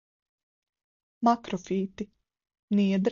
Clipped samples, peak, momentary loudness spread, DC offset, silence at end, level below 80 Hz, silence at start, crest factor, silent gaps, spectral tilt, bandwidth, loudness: under 0.1%; -12 dBFS; 13 LU; under 0.1%; 0 s; -68 dBFS; 1.2 s; 18 dB; 2.59-2.68 s; -7 dB/octave; 7.2 kHz; -28 LUFS